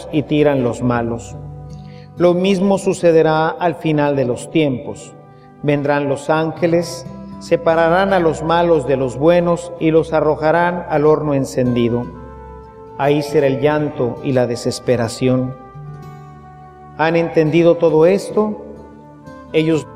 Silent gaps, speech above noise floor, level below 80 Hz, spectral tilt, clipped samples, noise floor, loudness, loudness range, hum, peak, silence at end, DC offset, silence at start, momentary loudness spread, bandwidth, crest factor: none; 23 dB; -44 dBFS; -6.5 dB/octave; under 0.1%; -38 dBFS; -16 LUFS; 4 LU; none; 0 dBFS; 0 s; under 0.1%; 0 s; 20 LU; 14 kHz; 16 dB